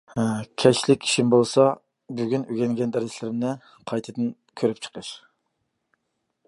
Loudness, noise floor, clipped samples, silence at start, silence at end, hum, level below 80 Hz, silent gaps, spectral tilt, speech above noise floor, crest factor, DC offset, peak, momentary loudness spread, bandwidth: -23 LUFS; -77 dBFS; under 0.1%; 0.15 s; 1.3 s; none; -66 dBFS; none; -5 dB/octave; 54 dB; 22 dB; under 0.1%; -2 dBFS; 17 LU; 11.5 kHz